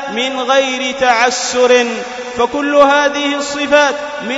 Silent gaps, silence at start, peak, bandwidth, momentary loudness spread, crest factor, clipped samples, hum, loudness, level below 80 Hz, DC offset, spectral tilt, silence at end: none; 0 s; 0 dBFS; 8 kHz; 8 LU; 14 dB; under 0.1%; none; -13 LUFS; -52 dBFS; under 0.1%; -1.5 dB/octave; 0 s